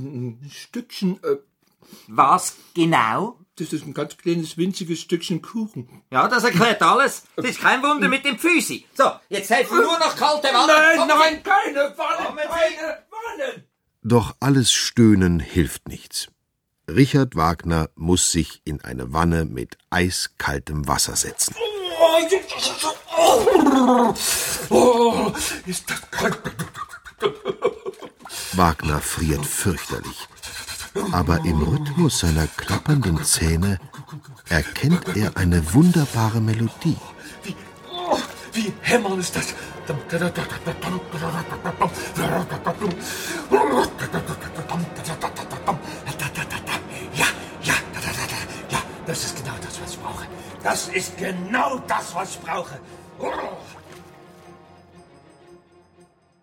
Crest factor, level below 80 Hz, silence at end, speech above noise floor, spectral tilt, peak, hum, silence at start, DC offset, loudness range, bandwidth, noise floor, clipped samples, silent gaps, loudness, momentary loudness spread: 22 dB; -40 dBFS; 0.9 s; 53 dB; -4.5 dB/octave; 0 dBFS; none; 0 s; under 0.1%; 9 LU; 18 kHz; -74 dBFS; under 0.1%; none; -21 LUFS; 16 LU